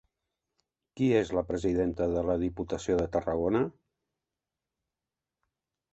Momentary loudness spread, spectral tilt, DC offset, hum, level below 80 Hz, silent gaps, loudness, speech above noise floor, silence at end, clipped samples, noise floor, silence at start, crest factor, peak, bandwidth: 5 LU; -7 dB/octave; under 0.1%; none; -50 dBFS; none; -30 LUFS; 61 dB; 2.2 s; under 0.1%; -90 dBFS; 0.95 s; 20 dB; -12 dBFS; 8.2 kHz